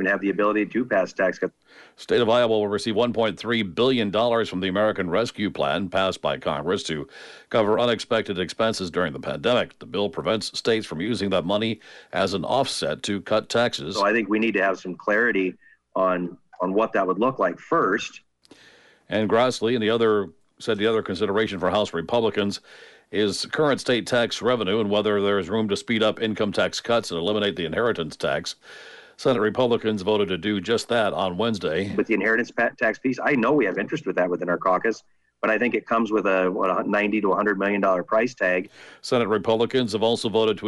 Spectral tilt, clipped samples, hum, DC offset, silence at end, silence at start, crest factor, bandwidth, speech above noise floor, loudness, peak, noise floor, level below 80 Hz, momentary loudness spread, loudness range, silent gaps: -5 dB/octave; under 0.1%; none; under 0.1%; 0 s; 0 s; 14 dB; 11.5 kHz; 31 dB; -23 LUFS; -8 dBFS; -54 dBFS; -60 dBFS; 6 LU; 2 LU; none